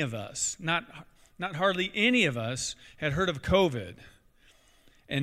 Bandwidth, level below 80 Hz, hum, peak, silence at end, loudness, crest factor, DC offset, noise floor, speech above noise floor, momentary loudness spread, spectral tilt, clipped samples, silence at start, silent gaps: 15 kHz; -52 dBFS; none; -10 dBFS; 0 s; -28 LUFS; 20 dB; under 0.1%; -61 dBFS; 32 dB; 13 LU; -4 dB/octave; under 0.1%; 0 s; none